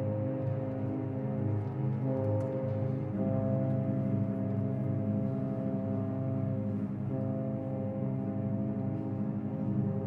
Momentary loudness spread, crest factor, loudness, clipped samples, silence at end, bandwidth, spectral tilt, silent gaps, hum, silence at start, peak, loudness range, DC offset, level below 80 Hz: 3 LU; 14 dB; -33 LUFS; under 0.1%; 0 s; 3.3 kHz; -12 dB/octave; none; none; 0 s; -18 dBFS; 2 LU; under 0.1%; -62 dBFS